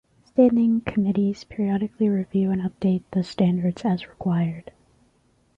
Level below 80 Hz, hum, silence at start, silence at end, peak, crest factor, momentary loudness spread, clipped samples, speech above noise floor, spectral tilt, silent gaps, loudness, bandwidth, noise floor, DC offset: -56 dBFS; none; 0.35 s; 0.95 s; -6 dBFS; 18 dB; 8 LU; under 0.1%; 41 dB; -9 dB/octave; none; -23 LUFS; 7.8 kHz; -63 dBFS; under 0.1%